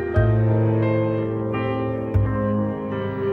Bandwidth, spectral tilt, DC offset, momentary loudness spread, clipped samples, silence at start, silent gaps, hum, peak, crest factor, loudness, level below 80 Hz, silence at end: 4 kHz; -11 dB/octave; under 0.1%; 6 LU; under 0.1%; 0 s; none; none; -6 dBFS; 14 dB; -22 LUFS; -36 dBFS; 0 s